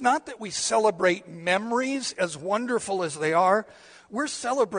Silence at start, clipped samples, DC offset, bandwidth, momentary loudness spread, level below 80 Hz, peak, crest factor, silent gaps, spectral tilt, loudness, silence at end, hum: 0 s; under 0.1%; under 0.1%; 10 kHz; 8 LU; -70 dBFS; -8 dBFS; 18 dB; none; -3 dB/octave; -26 LUFS; 0 s; none